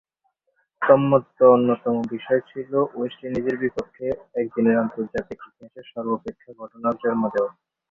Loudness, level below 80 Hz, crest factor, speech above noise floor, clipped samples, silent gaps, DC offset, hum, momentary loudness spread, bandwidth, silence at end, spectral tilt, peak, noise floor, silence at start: -22 LUFS; -60 dBFS; 22 dB; 50 dB; under 0.1%; none; under 0.1%; none; 15 LU; 6.6 kHz; 0.4 s; -9 dB/octave; -2 dBFS; -72 dBFS; 0.8 s